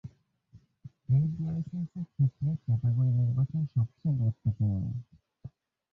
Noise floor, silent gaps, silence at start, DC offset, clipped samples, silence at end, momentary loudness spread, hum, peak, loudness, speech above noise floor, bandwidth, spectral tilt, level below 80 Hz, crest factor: -60 dBFS; none; 0.05 s; under 0.1%; under 0.1%; 0.45 s; 22 LU; none; -18 dBFS; -30 LUFS; 31 dB; 1.3 kHz; -12 dB/octave; -54 dBFS; 12 dB